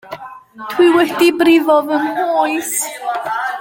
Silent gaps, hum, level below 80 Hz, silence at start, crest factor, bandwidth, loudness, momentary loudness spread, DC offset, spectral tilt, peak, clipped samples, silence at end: none; none; -60 dBFS; 0.05 s; 14 dB; 17 kHz; -14 LUFS; 19 LU; under 0.1%; -2.5 dB/octave; 0 dBFS; under 0.1%; 0 s